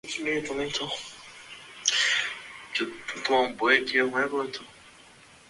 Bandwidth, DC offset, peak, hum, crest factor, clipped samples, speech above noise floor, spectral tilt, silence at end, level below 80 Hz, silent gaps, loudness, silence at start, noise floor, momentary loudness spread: 11.5 kHz; under 0.1%; -4 dBFS; none; 24 dB; under 0.1%; 26 dB; -1.5 dB/octave; 0.6 s; -66 dBFS; none; -26 LUFS; 0.05 s; -53 dBFS; 19 LU